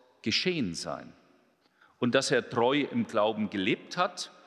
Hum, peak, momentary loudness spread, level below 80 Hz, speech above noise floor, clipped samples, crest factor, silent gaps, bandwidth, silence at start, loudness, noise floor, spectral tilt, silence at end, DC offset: none; -10 dBFS; 7 LU; -66 dBFS; 37 dB; under 0.1%; 20 dB; none; 12.5 kHz; 0.25 s; -29 LUFS; -66 dBFS; -4 dB/octave; 0.2 s; under 0.1%